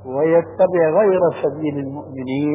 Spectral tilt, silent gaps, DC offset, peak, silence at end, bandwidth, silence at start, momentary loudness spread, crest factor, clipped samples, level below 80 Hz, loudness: -11.5 dB/octave; none; under 0.1%; -4 dBFS; 0 s; 3.8 kHz; 0 s; 12 LU; 14 dB; under 0.1%; -54 dBFS; -18 LUFS